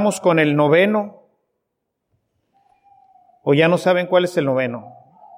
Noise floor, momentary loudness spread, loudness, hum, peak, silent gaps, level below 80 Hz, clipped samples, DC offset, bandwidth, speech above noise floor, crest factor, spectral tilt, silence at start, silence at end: -77 dBFS; 12 LU; -17 LUFS; none; -2 dBFS; none; -70 dBFS; under 0.1%; under 0.1%; 16 kHz; 60 dB; 16 dB; -6 dB/octave; 0 s; 0.5 s